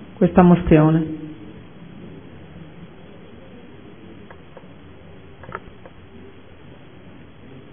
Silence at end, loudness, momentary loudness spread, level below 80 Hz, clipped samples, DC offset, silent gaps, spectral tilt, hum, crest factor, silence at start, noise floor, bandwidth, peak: 2.15 s; -16 LUFS; 29 LU; -42 dBFS; under 0.1%; 0.5%; none; -12.5 dB/octave; none; 22 dB; 0 s; -44 dBFS; 3.6 kHz; 0 dBFS